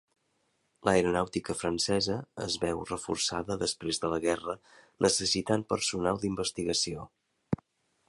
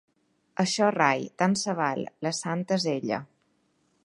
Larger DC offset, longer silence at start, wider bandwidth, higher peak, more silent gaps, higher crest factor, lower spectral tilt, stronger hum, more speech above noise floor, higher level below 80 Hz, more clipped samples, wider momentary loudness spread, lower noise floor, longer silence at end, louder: neither; first, 0.85 s vs 0.6 s; about the same, 11.5 kHz vs 11.5 kHz; about the same, -8 dBFS vs -6 dBFS; neither; about the same, 22 dB vs 22 dB; about the same, -3.5 dB/octave vs -4.5 dB/octave; neither; about the same, 44 dB vs 43 dB; first, -56 dBFS vs -74 dBFS; neither; about the same, 10 LU vs 8 LU; first, -75 dBFS vs -70 dBFS; second, 0.55 s vs 0.8 s; second, -30 LUFS vs -27 LUFS